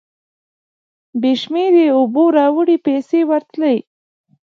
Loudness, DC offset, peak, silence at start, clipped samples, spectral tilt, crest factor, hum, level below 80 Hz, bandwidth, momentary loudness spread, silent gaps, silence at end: -15 LUFS; under 0.1%; -2 dBFS; 1.15 s; under 0.1%; -6.5 dB/octave; 14 dB; none; -74 dBFS; 6.8 kHz; 6 LU; none; 0.7 s